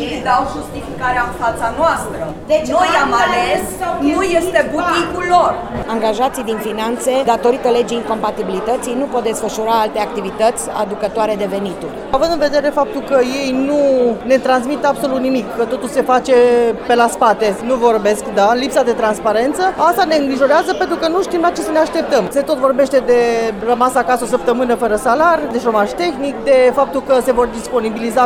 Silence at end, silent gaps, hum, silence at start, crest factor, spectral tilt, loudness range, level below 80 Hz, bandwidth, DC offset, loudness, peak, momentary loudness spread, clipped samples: 0 s; none; none; 0 s; 14 dB; -4 dB/octave; 3 LU; -40 dBFS; 17 kHz; under 0.1%; -15 LUFS; 0 dBFS; 7 LU; under 0.1%